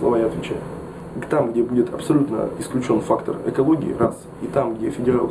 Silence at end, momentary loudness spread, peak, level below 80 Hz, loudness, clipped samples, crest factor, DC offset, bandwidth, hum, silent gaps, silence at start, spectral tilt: 0 s; 10 LU; -4 dBFS; -48 dBFS; -21 LUFS; under 0.1%; 16 dB; under 0.1%; 11 kHz; none; none; 0 s; -7.5 dB/octave